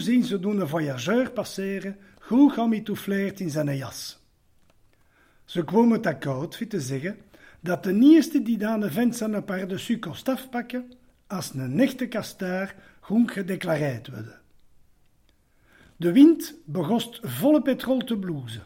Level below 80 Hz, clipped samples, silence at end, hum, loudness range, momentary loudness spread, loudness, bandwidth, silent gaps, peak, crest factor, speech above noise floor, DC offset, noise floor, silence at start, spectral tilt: -64 dBFS; under 0.1%; 0 s; none; 6 LU; 15 LU; -24 LUFS; 16.5 kHz; none; -4 dBFS; 20 dB; 38 dB; under 0.1%; -62 dBFS; 0 s; -6 dB/octave